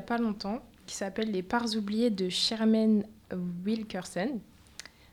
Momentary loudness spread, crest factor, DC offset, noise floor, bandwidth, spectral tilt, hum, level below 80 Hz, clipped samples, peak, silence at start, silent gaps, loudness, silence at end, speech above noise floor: 15 LU; 16 dB; under 0.1%; -51 dBFS; 13 kHz; -5 dB/octave; none; -62 dBFS; under 0.1%; -16 dBFS; 0 s; none; -30 LUFS; 0.7 s; 21 dB